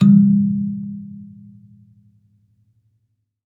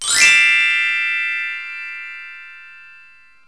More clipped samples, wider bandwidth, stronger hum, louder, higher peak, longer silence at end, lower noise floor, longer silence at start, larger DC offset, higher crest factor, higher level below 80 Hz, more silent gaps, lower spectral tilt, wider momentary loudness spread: neither; second, 3.9 kHz vs 11 kHz; neither; second, -17 LUFS vs -13 LUFS; about the same, -2 dBFS vs 0 dBFS; first, 2.2 s vs 0.6 s; first, -69 dBFS vs -48 dBFS; about the same, 0 s vs 0 s; second, under 0.1% vs 0.3%; about the same, 18 dB vs 18 dB; second, -72 dBFS vs -62 dBFS; neither; first, -10.5 dB/octave vs 3 dB/octave; first, 26 LU vs 22 LU